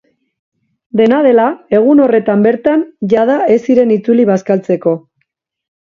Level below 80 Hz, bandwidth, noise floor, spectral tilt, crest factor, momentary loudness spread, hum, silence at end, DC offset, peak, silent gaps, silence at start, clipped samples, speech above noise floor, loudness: -58 dBFS; 7.2 kHz; -67 dBFS; -8 dB/octave; 12 dB; 6 LU; none; 0.9 s; under 0.1%; 0 dBFS; none; 0.95 s; under 0.1%; 57 dB; -11 LUFS